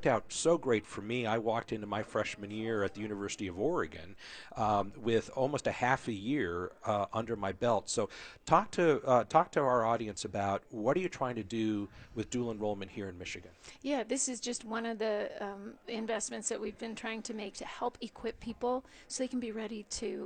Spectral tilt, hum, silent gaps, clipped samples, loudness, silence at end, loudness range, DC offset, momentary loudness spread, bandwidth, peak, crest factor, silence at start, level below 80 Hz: -4.5 dB/octave; none; none; under 0.1%; -34 LUFS; 0 s; 8 LU; under 0.1%; 12 LU; 9.6 kHz; -12 dBFS; 22 dB; 0 s; -62 dBFS